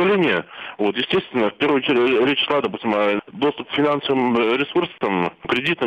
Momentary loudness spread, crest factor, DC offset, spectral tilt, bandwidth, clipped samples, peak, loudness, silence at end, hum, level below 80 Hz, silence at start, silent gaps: 6 LU; 12 dB; under 0.1%; -6.5 dB/octave; 8.6 kHz; under 0.1%; -6 dBFS; -20 LUFS; 0 s; none; -58 dBFS; 0 s; none